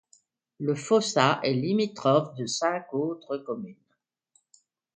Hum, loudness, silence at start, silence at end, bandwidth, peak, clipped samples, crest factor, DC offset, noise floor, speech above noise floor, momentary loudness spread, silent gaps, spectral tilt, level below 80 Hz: none; -27 LUFS; 0.6 s; 1.25 s; 9.4 kHz; -6 dBFS; under 0.1%; 22 dB; under 0.1%; -78 dBFS; 52 dB; 11 LU; none; -5 dB/octave; -72 dBFS